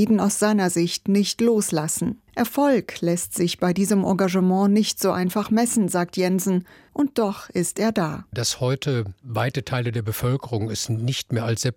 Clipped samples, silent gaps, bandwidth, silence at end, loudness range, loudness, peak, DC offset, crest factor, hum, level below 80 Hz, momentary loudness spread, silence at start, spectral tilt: under 0.1%; none; 17 kHz; 0 s; 4 LU; -22 LUFS; -8 dBFS; under 0.1%; 14 dB; none; -56 dBFS; 6 LU; 0 s; -5 dB/octave